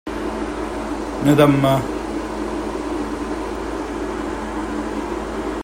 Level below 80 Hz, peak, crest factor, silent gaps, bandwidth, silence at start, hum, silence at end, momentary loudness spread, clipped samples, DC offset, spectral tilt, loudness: -36 dBFS; 0 dBFS; 20 dB; none; 16 kHz; 0.05 s; none; 0 s; 12 LU; under 0.1%; under 0.1%; -6.5 dB/octave; -22 LUFS